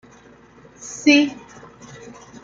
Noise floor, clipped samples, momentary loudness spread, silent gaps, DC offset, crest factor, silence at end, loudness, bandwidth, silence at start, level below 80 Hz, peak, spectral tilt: -48 dBFS; under 0.1%; 26 LU; none; under 0.1%; 22 dB; 1.1 s; -17 LUFS; 7.6 kHz; 0.85 s; -62 dBFS; -2 dBFS; -2.5 dB/octave